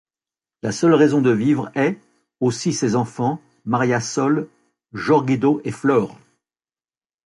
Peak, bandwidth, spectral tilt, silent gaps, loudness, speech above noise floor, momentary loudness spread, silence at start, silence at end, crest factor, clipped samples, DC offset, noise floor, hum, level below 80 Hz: -4 dBFS; 11.5 kHz; -6 dB/octave; none; -19 LUFS; over 72 dB; 13 LU; 0.65 s; 1.1 s; 16 dB; under 0.1%; under 0.1%; under -90 dBFS; none; -60 dBFS